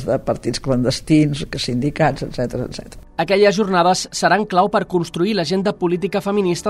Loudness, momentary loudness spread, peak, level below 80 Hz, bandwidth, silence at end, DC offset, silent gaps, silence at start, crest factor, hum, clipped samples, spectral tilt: -18 LUFS; 9 LU; -2 dBFS; -42 dBFS; 14.5 kHz; 0 s; under 0.1%; none; 0 s; 16 dB; none; under 0.1%; -5.5 dB/octave